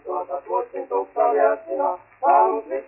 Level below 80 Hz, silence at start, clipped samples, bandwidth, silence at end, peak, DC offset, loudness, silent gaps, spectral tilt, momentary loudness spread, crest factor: -68 dBFS; 0.05 s; under 0.1%; 2.9 kHz; 0 s; -6 dBFS; under 0.1%; -22 LUFS; none; -5 dB/octave; 9 LU; 16 dB